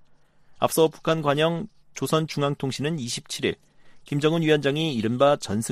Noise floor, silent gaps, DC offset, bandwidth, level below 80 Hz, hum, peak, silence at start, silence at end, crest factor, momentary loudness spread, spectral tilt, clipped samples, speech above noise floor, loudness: -54 dBFS; none; under 0.1%; 15 kHz; -60 dBFS; none; -6 dBFS; 0.5 s; 0 s; 18 dB; 9 LU; -5 dB/octave; under 0.1%; 30 dB; -24 LUFS